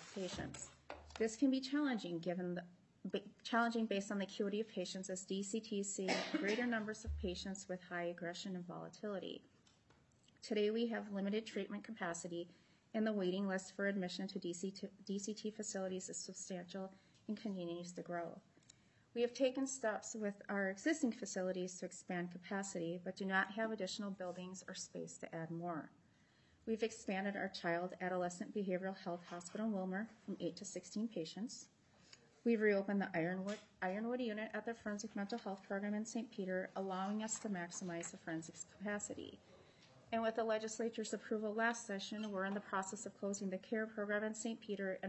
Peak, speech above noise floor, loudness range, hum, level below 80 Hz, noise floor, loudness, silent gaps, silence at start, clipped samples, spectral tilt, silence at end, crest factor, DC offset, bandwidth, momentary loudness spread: -22 dBFS; 30 dB; 5 LU; none; -68 dBFS; -72 dBFS; -42 LUFS; none; 0 s; under 0.1%; -4.5 dB/octave; 0 s; 20 dB; under 0.1%; 8.2 kHz; 10 LU